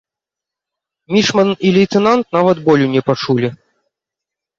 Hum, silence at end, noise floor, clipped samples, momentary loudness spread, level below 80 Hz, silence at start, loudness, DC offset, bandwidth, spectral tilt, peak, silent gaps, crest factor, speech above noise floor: none; 1.05 s; -85 dBFS; under 0.1%; 5 LU; -54 dBFS; 1.1 s; -14 LUFS; under 0.1%; 7.6 kHz; -6 dB/octave; 0 dBFS; none; 14 dB; 72 dB